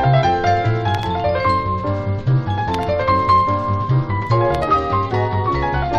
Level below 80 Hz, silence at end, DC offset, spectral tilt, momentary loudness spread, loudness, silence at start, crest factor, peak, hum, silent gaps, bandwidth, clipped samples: -34 dBFS; 0 s; under 0.1%; -7.5 dB/octave; 5 LU; -18 LUFS; 0 s; 14 dB; -4 dBFS; none; none; 8 kHz; under 0.1%